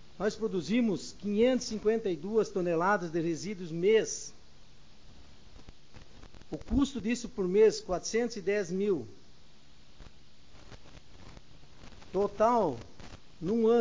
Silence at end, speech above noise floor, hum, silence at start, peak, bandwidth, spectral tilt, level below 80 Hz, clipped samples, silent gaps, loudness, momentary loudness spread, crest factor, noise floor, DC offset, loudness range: 0 s; 30 dB; none; 0.2 s; -14 dBFS; 7.6 kHz; -5 dB/octave; -54 dBFS; under 0.1%; none; -30 LUFS; 13 LU; 18 dB; -59 dBFS; 0.4%; 8 LU